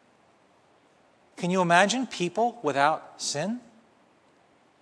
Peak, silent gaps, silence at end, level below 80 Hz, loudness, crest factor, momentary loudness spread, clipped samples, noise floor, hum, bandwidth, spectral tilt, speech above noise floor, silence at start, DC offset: -4 dBFS; none; 1.2 s; -78 dBFS; -26 LUFS; 24 dB; 12 LU; under 0.1%; -62 dBFS; none; 11 kHz; -4 dB/octave; 36 dB; 1.4 s; under 0.1%